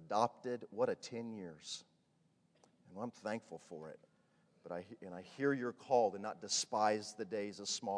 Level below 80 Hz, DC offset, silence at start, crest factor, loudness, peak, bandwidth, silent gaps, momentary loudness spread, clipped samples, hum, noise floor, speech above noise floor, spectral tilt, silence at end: -90 dBFS; under 0.1%; 0 s; 22 dB; -40 LUFS; -18 dBFS; 10.5 kHz; none; 17 LU; under 0.1%; none; -76 dBFS; 36 dB; -3 dB/octave; 0 s